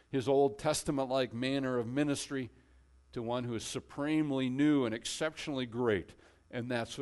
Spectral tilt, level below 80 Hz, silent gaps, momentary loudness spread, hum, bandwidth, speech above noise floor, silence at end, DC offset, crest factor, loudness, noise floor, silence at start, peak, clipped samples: -5 dB/octave; -62 dBFS; none; 11 LU; none; 11.5 kHz; 30 dB; 0 s; under 0.1%; 16 dB; -34 LUFS; -63 dBFS; 0.1 s; -18 dBFS; under 0.1%